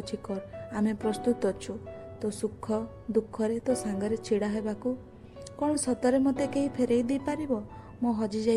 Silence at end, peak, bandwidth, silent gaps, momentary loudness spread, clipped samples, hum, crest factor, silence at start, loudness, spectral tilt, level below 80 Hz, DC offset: 0 s; -14 dBFS; 12.5 kHz; none; 11 LU; under 0.1%; none; 16 dB; 0 s; -30 LUFS; -5.5 dB/octave; -58 dBFS; under 0.1%